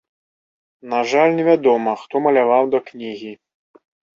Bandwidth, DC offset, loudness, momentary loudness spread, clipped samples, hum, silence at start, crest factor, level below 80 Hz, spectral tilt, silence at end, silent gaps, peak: 7.4 kHz; under 0.1%; -17 LUFS; 16 LU; under 0.1%; none; 0.85 s; 16 dB; -68 dBFS; -6 dB/octave; 0.8 s; none; -2 dBFS